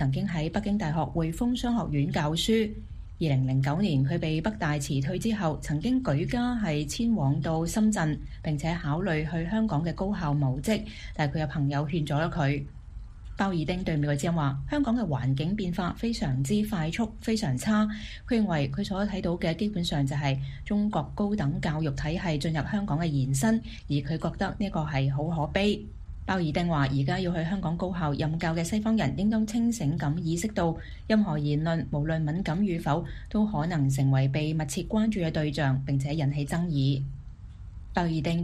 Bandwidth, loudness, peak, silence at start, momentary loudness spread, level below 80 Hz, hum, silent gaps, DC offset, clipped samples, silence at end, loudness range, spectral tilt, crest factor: 14.5 kHz; -28 LUFS; -10 dBFS; 0 s; 5 LU; -42 dBFS; none; none; under 0.1%; under 0.1%; 0 s; 2 LU; -6.5 dB/octave; 16 dB